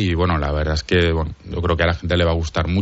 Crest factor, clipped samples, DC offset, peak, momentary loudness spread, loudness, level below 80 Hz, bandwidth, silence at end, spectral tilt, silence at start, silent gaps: 14 dB; under 0.1%; under 0.1%; -4 dBFS; 6 LU; -20 LUFS; -28 dBFS; 8 kHz; 0 s; -5 dB/octave; 0 s; none